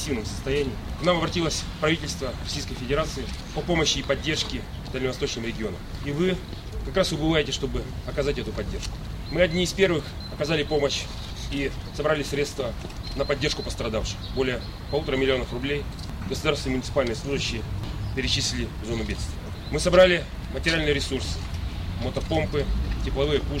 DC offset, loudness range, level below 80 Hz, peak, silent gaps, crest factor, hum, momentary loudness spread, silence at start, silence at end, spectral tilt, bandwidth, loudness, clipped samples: under 0.1%; 4 LU; -34 dBFS; -6 dBFS; none; 20 dB; none; 10 LU; 0 s; 0 s; -4.5 dB/octave; 16 kHz; -26 LUFS; under 0.1%